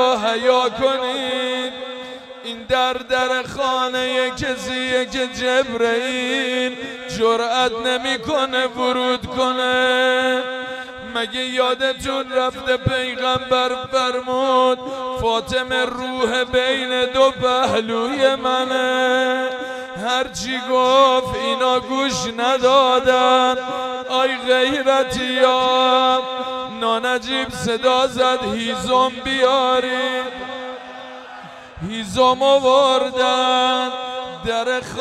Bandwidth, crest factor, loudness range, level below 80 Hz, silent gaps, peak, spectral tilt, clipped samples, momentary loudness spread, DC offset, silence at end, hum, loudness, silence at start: 13 kHz; 16 dB; 4 LU; -50 dBFS; none; -2 dBFS; -3 dB/octave; under 0.1%; 11 LU; under 0.1%; 0 s; none; -18 LUFS; 0 s